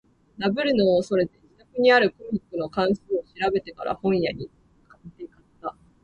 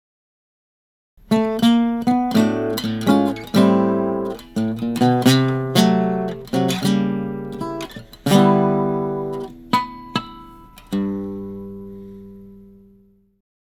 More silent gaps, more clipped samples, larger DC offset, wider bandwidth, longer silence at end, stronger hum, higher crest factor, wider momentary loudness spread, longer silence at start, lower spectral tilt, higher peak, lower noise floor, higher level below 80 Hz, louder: neither; neither; neither; second, 9.8 kHz vs 18.5 kHz; second, 0.35 s vs 1 s; neither; about the same, 20 dB vs 20 dB; about the same, 18 LU vs 16 LU; second, 0.4 s vs 1.3 s; about the same, -6.5 dB/octave vs -6 dB/octave; second, -6 dBFS vs 0 dBFS; second, -50 dBFS vs -54 dBFS; second, -56 dBFS vs -50 dBFS; second, -23 LUFS vs -19 LUFS